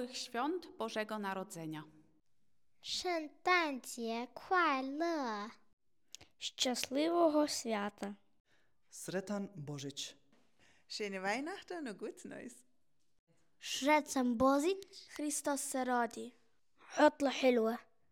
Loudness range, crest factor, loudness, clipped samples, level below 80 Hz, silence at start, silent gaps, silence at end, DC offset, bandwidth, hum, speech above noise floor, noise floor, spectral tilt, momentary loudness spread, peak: 9 LU; 22 dB; -36 LUFS; under 0.1%; -74 dBFS; 0 s; 5.73-5.77 s, 8.40-8.45 s, 13.19-13.27 s; 0.3 s; under 0.1%; 17.5 kHz; none; 48 dB; -85 dBFS; -3 dB/octave; 18 LU; -16 dBFS